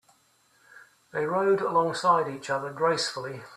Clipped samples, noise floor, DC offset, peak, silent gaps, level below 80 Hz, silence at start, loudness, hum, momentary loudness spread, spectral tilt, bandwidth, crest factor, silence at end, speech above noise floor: under 0.1%; -65 dBFS; under 0.1%; -10 dBFS; none; -72 dBFS; 0.75 s; -26 LUFS; none; 8 LU; -4 dB/octave; 13.5 kHz; 18 dB; 0 s; 39 dB